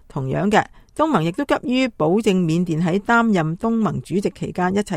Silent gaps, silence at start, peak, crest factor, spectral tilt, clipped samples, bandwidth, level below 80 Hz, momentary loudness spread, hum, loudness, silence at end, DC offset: none; 0.15 s; 0 dBFS; 18 dB; -6.5 dB/octave; under 0.1%; 13.5 kHz; -48 dBFS; 6 LU; none; -20 LUFS; 0 s; under 0.1%